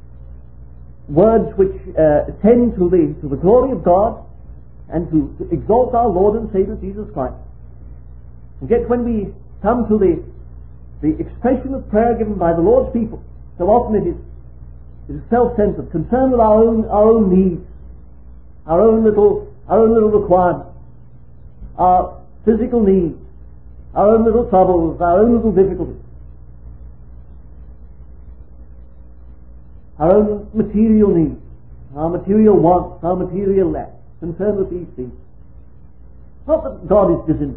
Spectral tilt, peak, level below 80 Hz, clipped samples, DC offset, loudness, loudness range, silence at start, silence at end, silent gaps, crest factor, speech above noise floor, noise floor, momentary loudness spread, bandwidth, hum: -14 dB/octave; 0 dBFS; -34 dBFS; under 0.1%; 1%; -15 LUFS; 6 LU; 0.15 s; 0 s; none; 16 dB; 28 dB; -42 dBFS; 14 LU; 3.4 kHz; 60 Hz at -35 dBFS